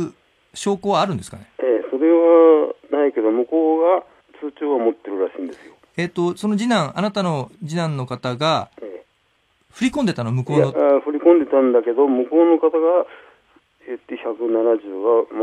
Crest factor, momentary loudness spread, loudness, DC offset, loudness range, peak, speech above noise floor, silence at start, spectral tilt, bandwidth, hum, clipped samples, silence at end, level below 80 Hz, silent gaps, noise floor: 18 dB; 16 LU; -18 LUFS; under 0.1%; 6 LU; -2 dBFS; 45 dB; 0 s; -6.5 dB/octave; 11.5 kHz; none; under 0.1%; 0 s; -62 dBFS; none; -63 dBFS